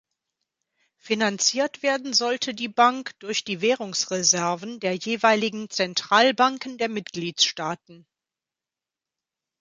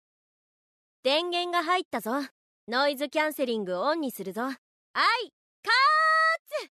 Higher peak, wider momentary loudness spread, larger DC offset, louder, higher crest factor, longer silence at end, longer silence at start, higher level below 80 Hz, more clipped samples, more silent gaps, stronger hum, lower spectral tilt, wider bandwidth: first, -2 dBFS vs -12 dBFS; second, 9 LU vs 13 LU; neither; first, -23 LUFS vs -26 LUFS; first, 22 dB vs 16 dB; first, 1.65 s vs 0.1 s; about the same, 1.05 s vs 1.05 s; first, -74 dBFS vs -86 dBFS; neither; second, none vs 1.85-1.91 s, 2.31-2.67 s, 4.58-4.94 s, 5.33-5.63 s, 6.39-6.45 s; neither; about the same, -2 dB/octave vs -3 dB/octave; second, 11 kHz vs 13.5 kHz